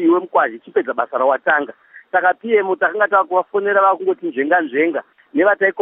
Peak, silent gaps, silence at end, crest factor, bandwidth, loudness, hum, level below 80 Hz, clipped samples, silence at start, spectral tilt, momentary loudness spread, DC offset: -2 dBFS; none; 0 s; 16 dB; 3.8 kHz; -17 LUFS; none; -82 dBFS; under 0.1%; 0 s; -9 dB/octave; 7 LU; under 0.1%